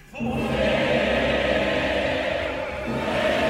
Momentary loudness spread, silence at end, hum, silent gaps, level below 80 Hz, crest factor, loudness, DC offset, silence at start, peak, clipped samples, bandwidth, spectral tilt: 7 LU; 0 s; none; none; -40 dBFS; 14 dB; -23 LUFS; under 0.1%; 0.05 s; -10 dBFS; under 0.1%; 15.5 kHz; -5.5 dB/octave